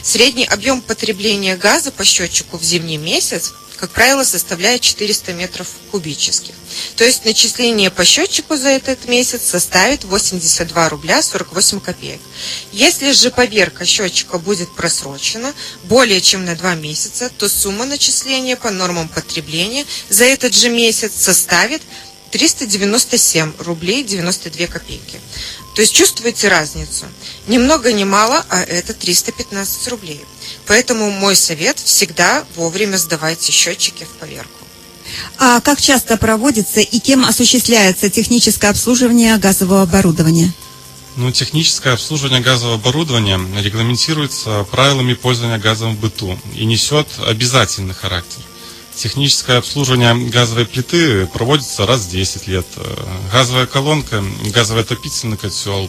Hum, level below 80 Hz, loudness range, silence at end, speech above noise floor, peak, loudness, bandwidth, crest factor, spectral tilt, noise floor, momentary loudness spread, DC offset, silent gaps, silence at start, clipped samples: none; -40 dBFS; 4 LU; 0 s; 21 dB; 0 dBFS; -13 LUFS; over 20 kHz; 14 dB; -3 dB/octave; -36 dBFS; 13 LU; under 0.1%; none; 0 s; under 0.1%